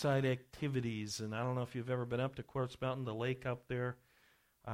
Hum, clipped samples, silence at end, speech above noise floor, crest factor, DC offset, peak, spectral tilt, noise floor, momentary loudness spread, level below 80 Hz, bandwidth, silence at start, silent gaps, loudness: none; under 0.1%; 0 s; 33 dB; 16 dB; under 0.1%; -24 dBFS; -6 dB/octave; -71 dBFS; 4 LU; -66 dBFS; 14 kHz; 0 s; none; -39 LUFS